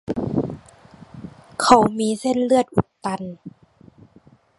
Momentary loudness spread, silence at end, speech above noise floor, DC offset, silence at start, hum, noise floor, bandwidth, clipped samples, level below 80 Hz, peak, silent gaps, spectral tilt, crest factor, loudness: 25 LU; 1.1 s; 35 dB; under 0.1%; 0.1 s; none; -53 dBFS; 11.5 kHz; under 0.1%; -50 dBFS; 0 dBFS; none; -5.5 dB/octave; 22 dB; -20 LUFS